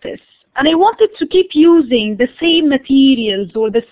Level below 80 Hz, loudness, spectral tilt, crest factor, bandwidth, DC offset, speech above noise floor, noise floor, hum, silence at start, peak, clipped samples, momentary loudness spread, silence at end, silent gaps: -50 dBFS; -12 LUFS; -9 dB/octave; 12 dB; 4 kHz; under 0.1%; 19 dB; -31 dBFS; none; 0.05 s; -2 dBFS; under 0.1%; 7 LU; 0.1 s; none